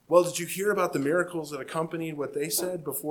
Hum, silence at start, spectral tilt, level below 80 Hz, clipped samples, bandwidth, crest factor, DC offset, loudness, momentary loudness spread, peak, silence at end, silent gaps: none; 0.1 s; -4 dB/octave; -70 dBFS; under 0.1%; 19 kHz; 22 dB; under 0.1%; -28 LUFS; 8 LU; -6 dBFS; 0 s; none